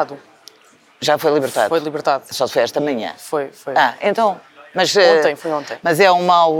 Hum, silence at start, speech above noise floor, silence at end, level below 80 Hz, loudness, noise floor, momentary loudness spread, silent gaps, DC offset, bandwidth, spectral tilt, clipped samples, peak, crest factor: none; 0 s; 34 dB; 0 s; -72 dBFS; -17 LUFS; -51 dBFS; 11 LU; none; under 0.1%; 18.5 kHz; -3.5 dB/octave; under 0.1%; 0 dBFS; 16 dB